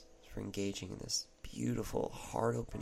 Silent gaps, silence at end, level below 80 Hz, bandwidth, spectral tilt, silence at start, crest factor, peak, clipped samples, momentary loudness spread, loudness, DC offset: none; 0 s; -54 dBFS; 15.5 kHz; -4.5 dB/octave; 0 s; 18 dB; -20 dBFS; under 0.1%; 9 LU; -39 LUFS; under 0.1%